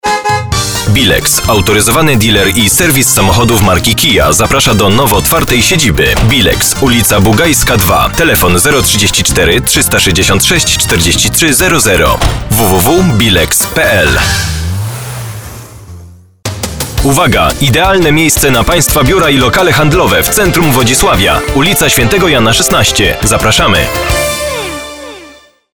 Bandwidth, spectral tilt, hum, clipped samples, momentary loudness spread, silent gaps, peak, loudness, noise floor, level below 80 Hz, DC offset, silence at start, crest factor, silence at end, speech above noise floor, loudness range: over 20 kHz; -3.5 dB/octave; none; under 0.1%; 7 LU; none; 0 dBFS; -7 LUFS; -37 dBFS; -22 dBFS; 2%; 0 s; 8 dB; 0 s; 29 dB; 4 LU